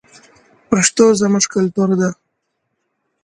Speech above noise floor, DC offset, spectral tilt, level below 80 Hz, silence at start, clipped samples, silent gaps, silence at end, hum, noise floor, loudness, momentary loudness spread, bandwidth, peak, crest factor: 58 dB; under 0.1%; -4.5 dB/octave; -56 dBFS; 0.7 s; under 0.1%; none; 1.1 s; none; -72 dBFS; -15 LUFS; 7 LU; 11 kHz; 0 dBFS; 18 dB